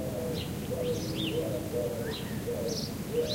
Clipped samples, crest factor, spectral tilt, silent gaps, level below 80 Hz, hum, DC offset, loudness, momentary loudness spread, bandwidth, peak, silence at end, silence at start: under 0.1%; 14 dB; -5 dB/octave; none; -50 dBFS; none; under 0.1%; -33 LUFS; 3 LU; 16 kHz; -18 dBFS; 0 s; 0 s